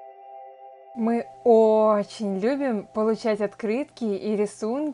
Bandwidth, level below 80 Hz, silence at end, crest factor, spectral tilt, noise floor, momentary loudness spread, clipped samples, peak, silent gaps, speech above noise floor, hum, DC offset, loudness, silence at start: 11 kHz; -72 dBFS; 0 s; 16 dB; -6.5 dB/octave; -45 dBFS; 19 LU; under 0.1%; -6 dBFS; none; 22 dB; none; under 0.1%; -24 LUFS; 0 s